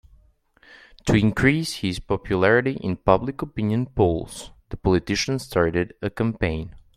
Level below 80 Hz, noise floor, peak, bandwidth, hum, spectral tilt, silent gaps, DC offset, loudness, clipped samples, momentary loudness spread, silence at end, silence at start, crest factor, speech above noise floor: -42 dBFS; -57 dBFS; -2 dBFS; 15 kHz; none; -6 dB/octave; none; under 0.1%; -23 LUFS; under 0.1%; 11 LU; 0.15 s; 1.05 s; 22 dB; 35 dB